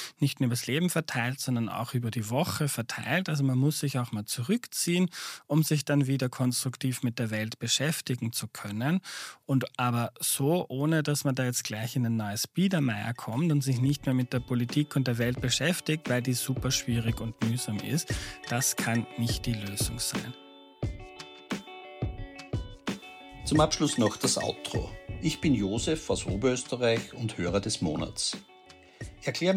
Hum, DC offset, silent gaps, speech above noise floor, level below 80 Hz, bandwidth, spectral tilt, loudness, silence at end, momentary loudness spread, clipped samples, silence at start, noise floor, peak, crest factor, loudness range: none; under 0.1%; none; 25 dB; -50 dBFS; 16 kHz; -4.5 dB/octave; -29 LUFS; 0 s; 11 LU; under 0.1%; 0 s; -54 dBFS; -10 dBFS; 20 dB; 3 LU